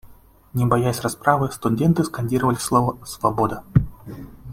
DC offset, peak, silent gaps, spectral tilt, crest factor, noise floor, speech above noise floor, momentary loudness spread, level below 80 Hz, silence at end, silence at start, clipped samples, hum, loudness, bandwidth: under 0.1%; -2 dBFS; none; -6.5 dB/octave; 20 dB; -48 dBFS; 28 dB; 11 LU; -42 dBFS; 0 s; 0.05 s; under 0.1%; none; -21 LUFS; 16.5 kHz